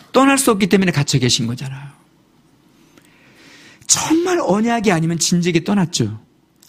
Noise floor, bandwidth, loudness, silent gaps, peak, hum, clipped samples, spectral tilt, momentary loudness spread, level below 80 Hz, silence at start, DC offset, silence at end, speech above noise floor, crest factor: -54 dBFS; 15.5 kHz; -16 LUFS; none; 0 dBFS; none; under 0.1%; -4 dB/octave; 13 LU; -50 dBFS; 0.15 s; under 0.1%; 0.5 s; 38 dB; 18 dB